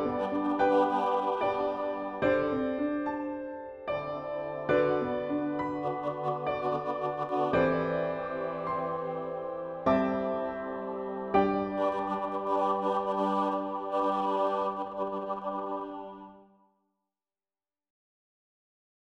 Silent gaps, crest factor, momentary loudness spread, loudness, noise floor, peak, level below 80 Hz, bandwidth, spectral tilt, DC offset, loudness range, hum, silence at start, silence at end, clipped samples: none; 18 dB; 9 LU; -31 LUFS; under -90 dBFS; -12 dBFS; -62 dBFS; 8.2 kHz; -8 dB/octave; under 0.1%; 5 LU; none; 0 s; 2.7 s; under 0.1%